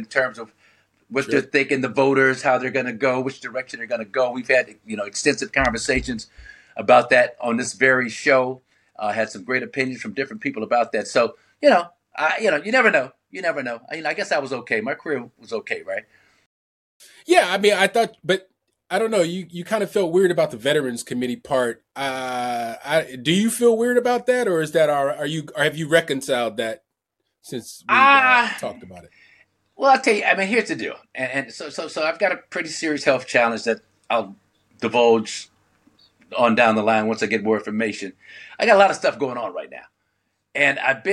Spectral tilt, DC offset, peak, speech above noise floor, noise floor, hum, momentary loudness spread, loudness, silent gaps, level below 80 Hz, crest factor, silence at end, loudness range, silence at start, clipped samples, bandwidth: -4 dB/octave; under 0.1%; -2 dBFS; 57 dB; -77 dBFS; none; 14 LU; -20 LUFS; 16.46-17.00 s; -52 dBFS; 18 dB; 0 s; 4 LU; 0 s; under 0.1%; 14 kHz